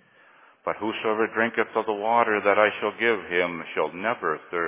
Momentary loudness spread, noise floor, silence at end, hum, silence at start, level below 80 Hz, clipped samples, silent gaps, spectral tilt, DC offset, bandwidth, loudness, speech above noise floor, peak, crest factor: 8 LU; -55 dBFS; 0 s; none; 0.65 s; -68 dBFS; under 0.1%; none; -8 dB/octave; under 0.1%; 3.8 kHz; -24 LUFS; 31 dB; -4 dBFS; 22 dB